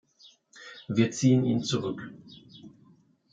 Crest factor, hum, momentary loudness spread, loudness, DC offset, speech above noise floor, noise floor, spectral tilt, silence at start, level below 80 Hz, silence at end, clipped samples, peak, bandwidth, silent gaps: 20 dB; none; 26 LU; -26 LUFS; under 0.1%; 35 dB; -61 dBFS; -6 dB/octave; 0.55 s; -70 dBFS; 0.65 s; under 0.1%; -10 dBFS; 9.2 kHz; none